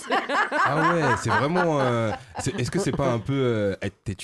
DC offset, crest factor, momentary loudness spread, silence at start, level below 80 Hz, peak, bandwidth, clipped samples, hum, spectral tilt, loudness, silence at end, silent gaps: under 0.1%; 16 dB; 8 LU; 0 s; -48 dBFS; -8 dBFS; 12.5 kHz; under 0.1%; none; -5.5 dB/octave; -24 LUFS; 0 s; none